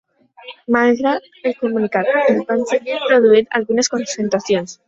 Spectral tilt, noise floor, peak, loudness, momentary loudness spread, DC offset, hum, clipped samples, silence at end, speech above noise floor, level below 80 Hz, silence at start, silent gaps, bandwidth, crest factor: -4 dB/octave; -40 dBFS; -2 dBFS; -17 LUFS; 8 LU; under 0.1%; none; under 0.1%; 0.15 s; 24 dB; -62 dBFS; 0.45 s; none; 8 kHz; 16 dB